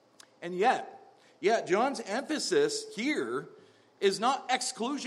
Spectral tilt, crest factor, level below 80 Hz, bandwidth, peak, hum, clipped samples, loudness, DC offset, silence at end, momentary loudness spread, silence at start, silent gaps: -3 dB/octave; 18 dB; -90 dBFS; 13 kHz; -12 dBFS; none; under 0.1%; -30 LUFS; under 0.1%; 0 s; 9 LU; 0.4 s; none